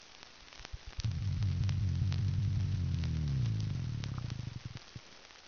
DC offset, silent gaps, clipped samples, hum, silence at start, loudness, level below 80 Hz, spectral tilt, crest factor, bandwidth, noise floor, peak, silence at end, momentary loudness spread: under 0.1%; none; under 0.1%; none; 0 s; -36 LUFS; -46 dBFS; -7 dB/octave; 14 dB; 6.8 kHz; -55 dBFS; -20 dBFS; 0 s; 18 LU